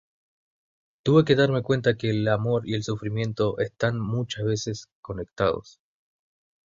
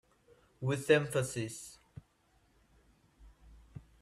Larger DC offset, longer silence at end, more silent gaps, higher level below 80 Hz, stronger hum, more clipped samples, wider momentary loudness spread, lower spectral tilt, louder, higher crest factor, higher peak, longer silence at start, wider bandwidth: neither; first, 0.95 s vs 0.2 s; first, 4.92-5.03 s vs none; first, -54 dBFS vs -64 dBFS; neither; neither; second, 13 LU vs 26 LU; first, -6.5 dB/octave vs -5 dB/octave; first, -25 LUFS vs -33 LUFS; about the same, 20 dB vs 24 dB; first, -4 dBFS vs -14 dBFS; first, 1.05 s vs 0.6 s; second, 7.6 kHz vs 14 kHz